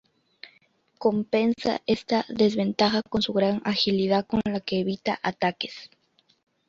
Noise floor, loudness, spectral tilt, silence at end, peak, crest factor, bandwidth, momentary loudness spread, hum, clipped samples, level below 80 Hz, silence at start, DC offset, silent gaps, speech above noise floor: -64 dBFS; -25 LUFS; -6 dB/octave; 0.8 s; -8 dBFS; 18 dB; 7.6 kHz; 5 LU; none; under 0.1%; -58 dBFS; 0.45 s; under 0.1%; none; 39 dB